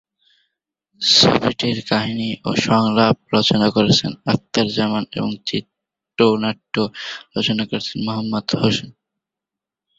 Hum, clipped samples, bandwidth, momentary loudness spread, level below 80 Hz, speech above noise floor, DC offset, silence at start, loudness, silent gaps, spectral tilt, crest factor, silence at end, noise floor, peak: none; under 0.1%; 8 kHz; 10 LU; -52 dBFS; 68 dB; under 0.1%; 1 s; -18 LUFS; none; -4.5 dB/octave; 20 dB; 1.1 s; -86 dBFS; 0 dBFS